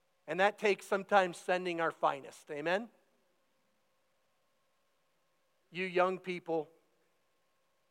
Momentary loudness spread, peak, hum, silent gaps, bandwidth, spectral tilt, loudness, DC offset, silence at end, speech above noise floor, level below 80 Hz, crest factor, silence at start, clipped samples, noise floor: 15 LU; -14 dBFS; none; none; 16.5 kHz; -4.5 dB/octave; -34 LUFS; under 0.1%; 1.25 s; 45 dB; under -90 dBFS; 24 dB; 0.25 s; under 0.1%; -78 dBFS